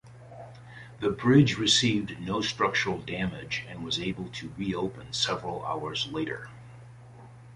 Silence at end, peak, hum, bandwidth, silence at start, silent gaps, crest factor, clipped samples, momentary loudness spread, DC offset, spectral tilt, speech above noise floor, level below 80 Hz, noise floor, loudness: 0 s; -8 dBFS; none; 11.5 kHz; 0.05 s; none; 22 dB; under 0.1%; 25 LU; under 0.1%; -4.5 dB/octave; 20 dB; -56 dBFS; -48 dBFS; -28 LUFS